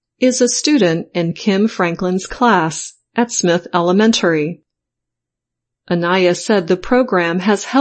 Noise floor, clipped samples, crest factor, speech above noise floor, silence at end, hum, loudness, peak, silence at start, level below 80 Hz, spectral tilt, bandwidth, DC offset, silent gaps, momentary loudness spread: -81 dBFS; under 0.1%; 14 dB; 67 dB; 0 s; none; -15 LUFS; 0 dBFS; 0.2 s; -48 dBFS; -4.5 dB/octave; 8.8 kHz; under 0.1%; none; 7 LU